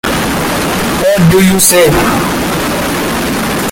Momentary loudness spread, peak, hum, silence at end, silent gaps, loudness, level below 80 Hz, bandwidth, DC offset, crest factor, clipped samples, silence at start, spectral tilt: 8 LU; 0 dBFS; none; 0 s; none; -10 LUFS; -28 dBFS; over 20 kHz; under 0.1%; 10 dB; 0.1%; 0.05 s; -4 dB/octave